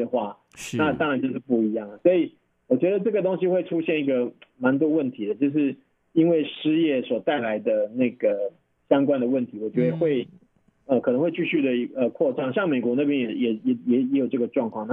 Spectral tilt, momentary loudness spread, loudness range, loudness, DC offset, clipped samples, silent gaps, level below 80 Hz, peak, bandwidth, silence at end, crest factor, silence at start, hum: -7 dB/octave; 6 LU; 1 LU; -24 LUFS; under 0.1%; under 0.1%; none; -70 dBFS; -6 dBFS; 10.5 kHz; 0 s; 18 dB; 0 s; none